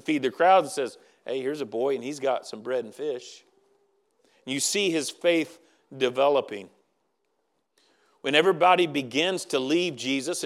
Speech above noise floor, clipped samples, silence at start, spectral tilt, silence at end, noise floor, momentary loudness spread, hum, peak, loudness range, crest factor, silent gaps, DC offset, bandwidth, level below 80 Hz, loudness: 50 dB; under 0.1%; 0.05 s; -3 dB/octave; 0 s; -75 dBFS; 14 LU; none; -4 dBFS; 6 LU; 22 dB; none; under 0.1%; 15.5 kHz; -88 dBFS; -25 LUFS